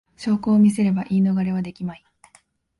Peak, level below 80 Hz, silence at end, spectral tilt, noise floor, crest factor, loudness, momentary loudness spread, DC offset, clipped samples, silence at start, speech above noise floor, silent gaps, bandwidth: -8 dBFS; -58 dBFS; 0.85 s; -8 dB/octave; -58 dBFS; 14 dB; -20 LUFS; 14 LU; under 0.1%; under 0.1%; 0.2 s; 39 dB; none; 11.5 kHz